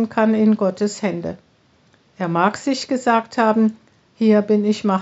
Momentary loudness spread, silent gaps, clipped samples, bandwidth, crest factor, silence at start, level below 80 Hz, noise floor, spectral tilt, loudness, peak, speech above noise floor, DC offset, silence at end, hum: 9 LU; none; under 0.1%; 8 kHz; 16 dB; 0 s; -66 dBFS; -57 dBFS; -5.5 dB/octave; -19 LUFS; -2 dBFS; 39 dB; under 0.1%; 0 s; none